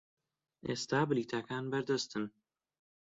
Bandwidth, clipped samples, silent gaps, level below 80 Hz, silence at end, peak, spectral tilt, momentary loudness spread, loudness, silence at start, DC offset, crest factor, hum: 7.8 kHz; under 0.1%; none; -74 dBFS; 0.75 s; -18 dBFS; -4.5 dB/octave; 10 LU; -36 LUFS; 0.65 s; under 0.1%; 18 dB; none